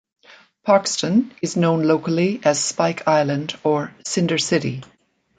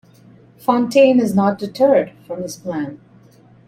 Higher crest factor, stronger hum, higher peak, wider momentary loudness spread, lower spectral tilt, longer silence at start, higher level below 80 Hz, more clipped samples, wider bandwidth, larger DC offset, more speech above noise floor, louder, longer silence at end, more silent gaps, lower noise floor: about the same, 18 dB vs 16 dB; neither; about the same, -2 dBFS vs -2 dBFS; second, 7 LU vs 15 LU; second, -4.5 dB/octave vs -6.5 dB/octave; about the same, 0.65 s vs 0.7 s; about the same, -62 dBFS vs -62 dBFS; neither; second, 9.6 kHz vs 15 kHz; neither; about the same, 30 dB vs 32 dB; second, -20 LUFS vs -17 LUFS; second, 0.55 s vs 0.7 s; neither; about the same, -49 dBFS vs -48 dBFS